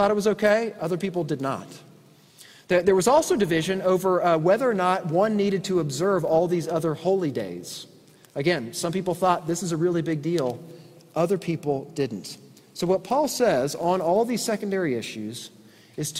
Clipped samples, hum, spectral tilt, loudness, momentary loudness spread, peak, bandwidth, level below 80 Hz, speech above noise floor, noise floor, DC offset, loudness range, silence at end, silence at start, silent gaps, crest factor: under 0.1%; none; -5.5 dB/octave; -24 LUFS; 14 LU; -6 dBFS; 16 kHz; -60 dBFS; 29 dB; -53 dBFS; under 0.1%; 5 LU; 0 s; 0 s; none; 18 dB